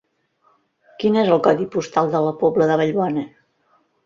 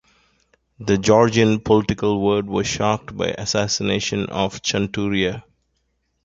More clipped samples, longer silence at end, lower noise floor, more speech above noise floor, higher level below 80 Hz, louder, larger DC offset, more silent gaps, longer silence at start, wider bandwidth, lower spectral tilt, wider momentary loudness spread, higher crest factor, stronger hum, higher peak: neither; about the same, 0.8 s vs 0.85 s; second, -63 dBFS vs -70 dBFS; second, 45 dB vs 50 dB; second, -62 dBFS vs -46 dBFS; about the same, -19 LUFS vs -20 LUFS; neither; neither; first, 1 s vs 0.8 s; about the same, 7.4 kHz vs 7.8 kHz; first, -7 dB/octave vs -4.5 dB/octave; about the same, 7 LU vs 8 LU; about the same, 18 dB vs 18 dB; neither; about the same, -2 dBFS vs -2 dBFS